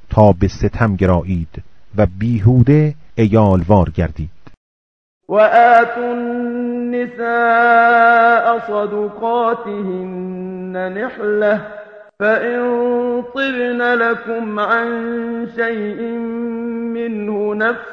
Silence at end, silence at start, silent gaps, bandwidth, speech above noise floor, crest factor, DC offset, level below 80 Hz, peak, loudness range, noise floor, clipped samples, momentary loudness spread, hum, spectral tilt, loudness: 0 s; 0 s; 4.57-5.21 s; 6.6 kHz; over 75 dB; 16 dB; under 0.1%; -36 dBFS; 0 dBFS; 6 LU; under -90 dBFS; under 0.1%; 13 LU; none; -8.5 dB/octave; -16 LUFS